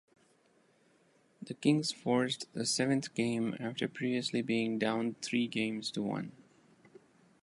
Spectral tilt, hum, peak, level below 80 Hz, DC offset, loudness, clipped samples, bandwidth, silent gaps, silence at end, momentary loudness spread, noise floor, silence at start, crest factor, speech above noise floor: -4.5 dB/octave; none; -16 dBFS; -78 dBFS; under 0.1%; -33 LUFS; under 0.1%; 11.5 kHz; none; 1.1 s; 7 LU; -69 dBFS; 1.4 s; 20 dB; 36 dB